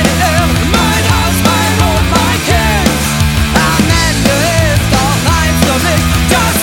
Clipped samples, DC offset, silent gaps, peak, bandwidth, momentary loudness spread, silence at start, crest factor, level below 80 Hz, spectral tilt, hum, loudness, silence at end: under 0.1%; under 0.1%; none; 0 dBFS; 18.5 kHz; 1 LU; 0 s; 10 dB; -18 dBFS; -4 dB/octave; none; -10 LUFS; 0 s